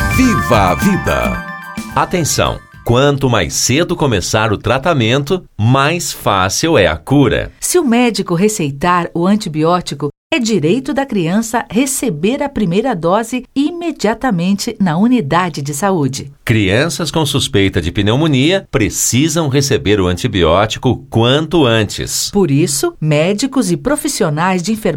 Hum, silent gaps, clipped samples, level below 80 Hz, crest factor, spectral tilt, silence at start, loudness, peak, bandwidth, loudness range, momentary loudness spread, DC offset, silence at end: none; 10.17-10.30 s; under 0.1%; -34 dBFS; 14 dB; -4.5 dB/octave; 0 s; -14 LUFS; 0 dBFS; 19.5 kHz; 2 LU; 5 LU; under 0.1%; 0 s